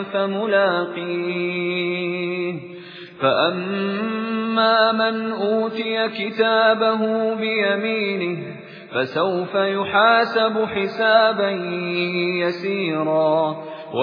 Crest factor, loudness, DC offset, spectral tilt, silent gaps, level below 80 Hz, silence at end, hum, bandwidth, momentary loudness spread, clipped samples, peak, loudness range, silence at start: 18 dB; -20 LUFS; under 0.1%; -7.5 dB/octave; none; -70 dBFS; 0 s; none; 5.2 kHz; 9 LU; under 0.1%; -2 dBFS; 4 LU; 0 s